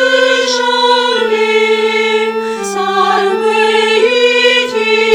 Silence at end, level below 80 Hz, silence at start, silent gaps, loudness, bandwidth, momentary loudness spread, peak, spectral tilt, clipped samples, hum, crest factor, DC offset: 0 s; -66 dBFS; 0 s; none; -11 LUFS; 16 kHz; 5 LU; 0 dBFS; -2 dB/octave; under 0.1%; none; 12 dB; under 0.1%